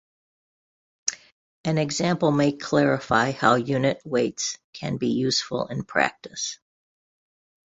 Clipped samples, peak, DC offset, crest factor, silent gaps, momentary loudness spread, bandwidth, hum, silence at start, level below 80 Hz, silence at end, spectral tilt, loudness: under 0.1%; -2 dBFS; under 0.1%; 22 dB; 1.32-1.64 s, 4.64-4.73 s; 10 LU; 8.2 kHz; none; 1.05 s; -60 dBFS; 1.2 s; -4.5 dB/octave; -24 LUFS